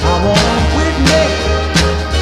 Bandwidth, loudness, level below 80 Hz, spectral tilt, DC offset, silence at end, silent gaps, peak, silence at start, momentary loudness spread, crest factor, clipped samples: 13 kHz; -12 LUFS; -18 dBFS; -4.5 dB/octave; under 0.1%; 0 s; none; 0 dBFS; 0 s; 3 LU; 12 dB; under 0.1%